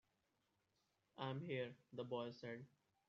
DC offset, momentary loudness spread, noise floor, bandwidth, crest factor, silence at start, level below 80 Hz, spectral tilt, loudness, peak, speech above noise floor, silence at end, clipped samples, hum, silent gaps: under 0.1%; 12 LU; -86 dBFS; 7.2 kHz; 20 dB; 1.15 s; under -90 dBFS; -5 dB/octave; -50 LUFS; -32 dBFS; 37 dB; 0.4 s; under 0.1%; none; none